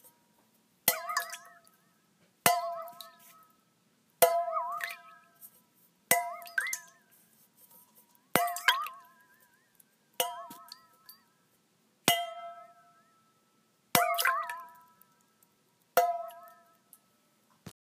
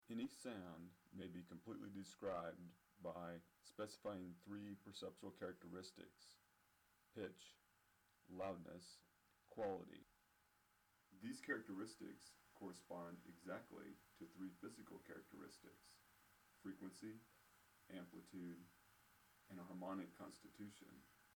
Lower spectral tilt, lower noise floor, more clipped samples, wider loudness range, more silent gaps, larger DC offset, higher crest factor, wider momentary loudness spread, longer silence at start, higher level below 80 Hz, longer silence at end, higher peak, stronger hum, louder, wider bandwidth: second, -1 dB/octave vs -5 dB/octave; second, -71 dBFS vs -80 dBFS; neither; about the same, 5 LU vs 6 LU; neither; neither; first, 32 dB vs 22 dB; first, 25 LU vs 15 LU; first, 0.85 s vs 0.05 s; first, -78 dBFS vs -88 dBFS; first, 0.2 s vs 0 s; first, -4 dBFS vs -32 dBFS; neither; first, -30 LUFS vs -55 LUFS; second, 15.5 kHz vs over 20 kHz